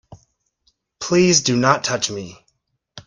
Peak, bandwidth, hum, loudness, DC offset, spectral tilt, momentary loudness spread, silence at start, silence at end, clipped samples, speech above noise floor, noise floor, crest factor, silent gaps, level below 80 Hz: 0 dBFS; 10.5 kHz; none; -17 LUFS; under 0.1%; -3.5 dB/octave; 17 LU; 0.1 s; 0.05 s; under 0.1%; 51 dB; -69 dBFS; 22 dB; none; -56 dBFS